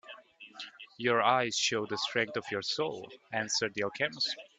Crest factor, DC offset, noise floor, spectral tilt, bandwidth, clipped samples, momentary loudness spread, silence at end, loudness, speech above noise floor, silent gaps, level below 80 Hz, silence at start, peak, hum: 22 dB; under 0.1%; -52 dBFS; -2.5 dB/octave; 9.2 kHz; under 0.1%; 18 LU; 0.15 s; -31 LUFS; 20 dB; none; -76 dBFS; 0.05 s; -10 dBFS; none